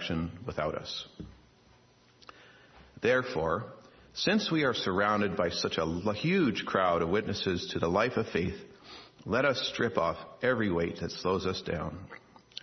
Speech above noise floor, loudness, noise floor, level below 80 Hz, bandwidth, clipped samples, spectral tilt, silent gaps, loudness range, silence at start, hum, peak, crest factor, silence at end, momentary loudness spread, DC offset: 32 dB; -30 LUFS; -62 dBFS; -60 dBFS; 6.4 kHz; under 0.1%; -5.5 dB/octave; none; 6 LU; 0 s; none; -12 dBFS; 20 dB; 0.05 s; 18 LU; under 0.1%